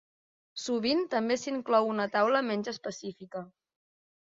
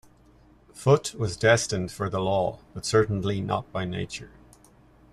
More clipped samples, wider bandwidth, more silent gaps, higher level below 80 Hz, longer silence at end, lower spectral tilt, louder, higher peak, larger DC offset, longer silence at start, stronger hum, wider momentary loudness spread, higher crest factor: neither; second, 7.8 kHz vs 13.5 kHz; neither; second, -74 dBFS vs -54 dBFS; about the same, 0.75 s vs 0.85 s; about the same, -4 dB/octave vs -5 dB/octave; second, -29 LUFS vs -26 LUFS; second, -12 dBFS vs -6 dBFS; neither; second, 0.55 s vs 0.75 s; neither; first, 15 LU vs 11 LU; about the same, 20 dB vs 20 dB